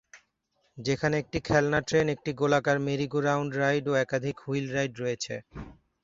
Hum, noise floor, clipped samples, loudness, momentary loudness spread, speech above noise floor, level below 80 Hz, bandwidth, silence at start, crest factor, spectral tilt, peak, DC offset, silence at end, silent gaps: none; -74 dBFS; under 0.1%; -28 LUFS; 9 LU; 46 dB; -56 dBFS; 7.8 kHz; 0.15 s; 20 dB; -5.5 dB/octave; -8 dBFS; under 0.1%; 0.3 s; none